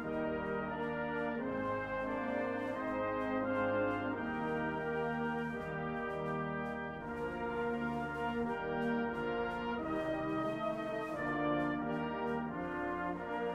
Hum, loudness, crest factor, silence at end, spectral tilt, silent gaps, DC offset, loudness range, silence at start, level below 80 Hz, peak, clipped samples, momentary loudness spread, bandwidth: none; -37 LUFS; 14 dB; 0 s; -7.5 dB/octave; none; under 0.1%; 2 LU; 0 s; -60 dBFS; -22 dBFS; under 0.1%; 4 LU; 11.5 kHz